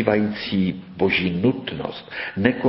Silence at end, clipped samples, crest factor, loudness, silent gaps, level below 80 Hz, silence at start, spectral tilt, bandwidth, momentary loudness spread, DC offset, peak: 0 s; under 0.1%; 20 dB; -23 LUFS; none; -48 dBFS; 0 s; -11 dB/octave; 5.8 kHz; 10 LU; under 0.1%; 0 dBFS